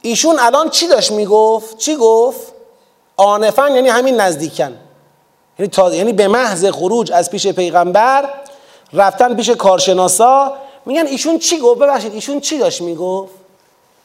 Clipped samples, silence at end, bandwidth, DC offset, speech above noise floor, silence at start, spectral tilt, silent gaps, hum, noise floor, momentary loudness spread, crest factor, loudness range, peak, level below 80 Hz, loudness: under 0.1%; 0.75 s; 16.5 kHz; under 0.1%; 42 dB; 0.05 s; -3 dB/octave; none; none; -54 dBFS; 10 LU; 14 dB; 3 LU; 0 dBFS; -62 dBFS; -12 LUFS